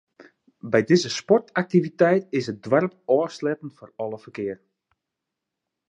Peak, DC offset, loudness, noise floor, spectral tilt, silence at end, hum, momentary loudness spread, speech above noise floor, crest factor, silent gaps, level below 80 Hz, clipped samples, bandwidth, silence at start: -4 dBFS; under 0.1%; -23 LUFS; -84 dBFS; -6 dB/octave; 1.35 s; none; 14 LU; 61 dB; 20 dB; none; -70 dBFS; under 0.1%; 9.6 kHz; 0.65 s